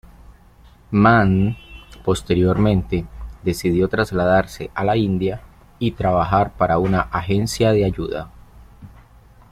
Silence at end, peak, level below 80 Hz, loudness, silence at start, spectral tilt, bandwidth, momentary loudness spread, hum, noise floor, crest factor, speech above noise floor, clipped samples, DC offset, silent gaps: 0.65 s; -2 dBFS; -38 dBFS; -19 LUFS; 0.3 s; -7 dB/octave; 15 kHz; 11 LU; none; -48 dBFS; 18 dB; 30 dB; under 0.1%; under 0.1%; none